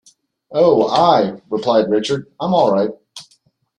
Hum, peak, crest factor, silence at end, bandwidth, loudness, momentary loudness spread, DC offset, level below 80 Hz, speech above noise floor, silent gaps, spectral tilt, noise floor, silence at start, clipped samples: none; -2 dBFS; 16 dB; 0.55 s; 10.5 kHz; -16 LUFS; 10 LU; under 0.1%; -58 dBFS; 44 dB; none; -6 dB/octave; -59 dBFS; 0.5 s; under 0.1%